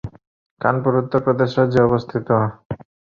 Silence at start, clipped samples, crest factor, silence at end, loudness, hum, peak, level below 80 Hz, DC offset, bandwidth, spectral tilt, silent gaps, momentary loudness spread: 0.05 s; under 0.1%; 18 dB; 0.4 s; -19 LUFS; none; -2 dBFS; -48 dBFS; under 0.1%; 7 kHz; -9 dB/octave; 0.27-0.57 s, 2.65-2.70 s; 17 LU